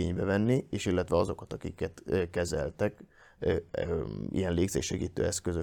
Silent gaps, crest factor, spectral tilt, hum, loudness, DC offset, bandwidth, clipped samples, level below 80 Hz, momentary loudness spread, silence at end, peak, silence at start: none; 18 dB; -5.5 dB/octave; none; -32 LUFS; under 0.1%; 18.5 kHz; under 0.1%; -52 dBFS; 7 LU; 0 s; -14 dBFS; 0 s